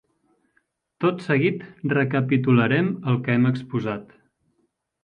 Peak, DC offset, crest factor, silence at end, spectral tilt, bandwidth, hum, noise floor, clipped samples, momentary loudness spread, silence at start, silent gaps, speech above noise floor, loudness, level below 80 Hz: -6 dBFS; under 0.1%; 18 dB; 1 s; -9 dB/octave; 5.4 kHz; none; -71 dBFS; under 0.1%; 9 LU; 1 s; none; 50 dB; -22 LUFS; -64 dBFS